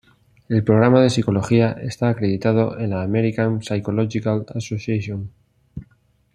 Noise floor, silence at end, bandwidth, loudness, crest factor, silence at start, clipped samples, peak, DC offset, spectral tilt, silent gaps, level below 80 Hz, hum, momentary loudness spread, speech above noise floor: -59 dBFS; 0.5 s; 10.5 kHz; -20 LUFS; 18 dB; 0.5 s; under 0.1%; -2 dBFS; under 0.1%; -7.5 dB/octave; none; -54 dBFS; none; 15 LU; 41 dB